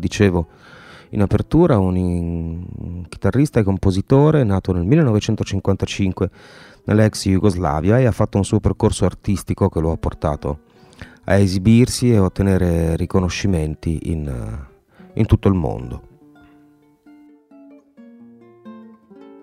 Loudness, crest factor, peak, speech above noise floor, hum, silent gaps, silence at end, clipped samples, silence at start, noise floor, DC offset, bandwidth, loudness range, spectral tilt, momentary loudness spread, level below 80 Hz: -18 LUFS; 18 dB; 0 dBFS; 35 dB; none; none; 0.15 s; under 0.1%; 0 s; -52 dBFS; under 0.1%; 14.5 kHz; 6 LU; -7 dB/octave; 14 LU; -34 dBFS